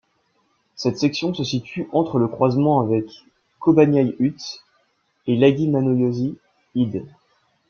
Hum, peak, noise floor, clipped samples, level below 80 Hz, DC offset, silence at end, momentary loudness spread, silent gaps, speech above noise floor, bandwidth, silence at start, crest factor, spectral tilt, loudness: none; -2 dBFS; -66 dBFS; under 0.1%; -60 dBFS; under 0.1%; 0.6 s; 13 LU; none; 47 dB; 7 kHz; 0.8 s; 18 dB; -7 dB/octave; -20 LUFS